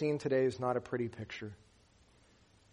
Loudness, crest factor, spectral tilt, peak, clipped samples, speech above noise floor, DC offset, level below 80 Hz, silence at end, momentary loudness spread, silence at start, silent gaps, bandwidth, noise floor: -35 LUFS; 18 dB; -7 dB/octave; -20 dBFS; under 0.1%; 31 dB; under 0.1%; -70 dBFS; 1.2 s; 14 LU; 0 s; none; 10.5 kHz; -66 dBFS